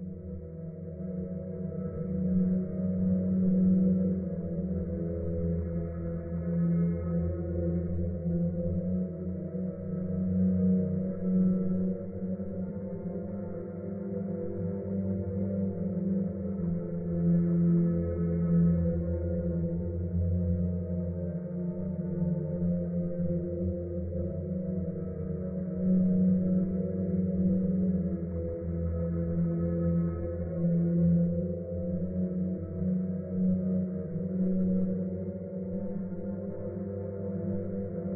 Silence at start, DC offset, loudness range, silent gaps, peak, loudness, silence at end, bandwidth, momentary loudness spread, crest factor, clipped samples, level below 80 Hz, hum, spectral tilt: 0 s; under 0.1%; 5 LU; none; -16 dBFS; -31 LUFS; 0 s; 2.3 kHz; 10 LU; 14 dB; under 0.1%; -46 dBFS; none; -13 dB/octave